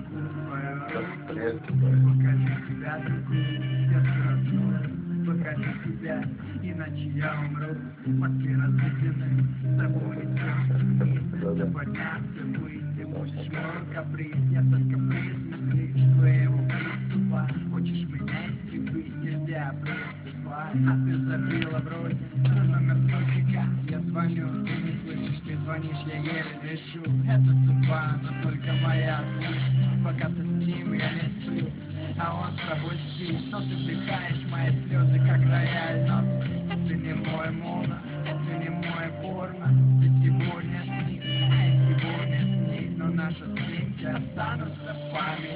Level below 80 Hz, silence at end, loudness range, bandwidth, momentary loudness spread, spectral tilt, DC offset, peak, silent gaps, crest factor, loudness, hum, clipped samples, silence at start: -52 dBFS; 0 s; 6 LU; 4 kHz; 11 LU; -11.5 dB/octave; under 0.1%; -10 dBFS; none; 16 dB; -27 LUFS; none; under 0.1%; 0 s